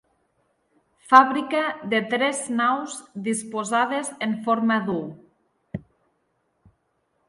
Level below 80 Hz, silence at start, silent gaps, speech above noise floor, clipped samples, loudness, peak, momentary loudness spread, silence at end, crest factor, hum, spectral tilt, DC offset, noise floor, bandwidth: -64 dBFS; 1.05 s; none; 49 dB; under 0.1%; -22 LUFS; 0 dBFS; 20 LU; 1.5 s; 24 dB; none; -4 dB/octave; under 0.1%; -71 dBFS; 11.5 kHz